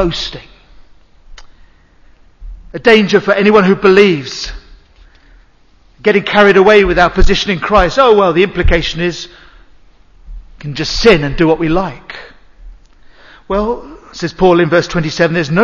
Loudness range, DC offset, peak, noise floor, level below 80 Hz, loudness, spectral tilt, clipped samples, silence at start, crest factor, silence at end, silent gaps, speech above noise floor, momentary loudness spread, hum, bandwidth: 6 LU; under 0.1%; 0 dBFS; -46 dBFS; -24 dBFS; -11 LUFS; -5.5 dB/octave; 0.3%; 0 s; 12 dB; 0 s; none; 36 dB; 17 LU; none; 7.4 kHz